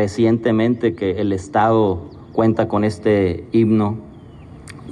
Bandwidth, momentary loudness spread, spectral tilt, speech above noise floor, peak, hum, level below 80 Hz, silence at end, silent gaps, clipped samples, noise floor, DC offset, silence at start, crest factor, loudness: 10 kHz; 10 LU; -8 dB/octave; 22 dB; -4 dBFS; none; -50 dBFS; 0 s; none; under 0.1%; -39 dBFS; under 0.1%; 0 s; 14 dB; -18 LUFS